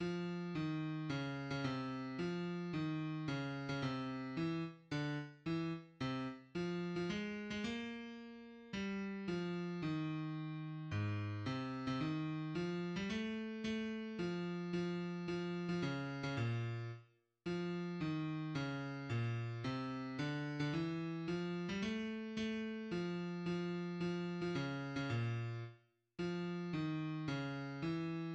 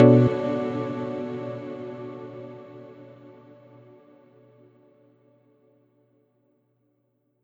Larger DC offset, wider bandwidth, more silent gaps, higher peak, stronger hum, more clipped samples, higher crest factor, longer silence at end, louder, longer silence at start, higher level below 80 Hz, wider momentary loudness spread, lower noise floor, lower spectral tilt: neither; first, 8.4 kHz vs 6.8 kHz; neither; second, -26 dBFS vs -2 dBFS; neither; neither; second, 14 dB vs 26 dB; second, 0 s vs 4.15 s; second, -42 LUFS vs -26 LUFS; about the same, 0 s vs 0 s; second, -70 dBFS vs -64 dBFS; second, 4 LU vs 26 LU; second, -65 dBFS vs -71 dBFS; second, -7 dB/octave vs -10 dB/octave